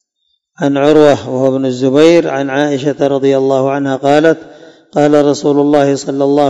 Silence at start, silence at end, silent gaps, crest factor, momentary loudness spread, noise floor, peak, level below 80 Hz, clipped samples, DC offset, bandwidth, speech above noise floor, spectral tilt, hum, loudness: 0.6 s; 0 s; none; 10 dB; 7 LU; -65 dBFS; 0 dBFS; -54 dBFS; 1%; under 0.1%; 9 kHz; 54 dB; -6 dB/octave; none; -11 LUFS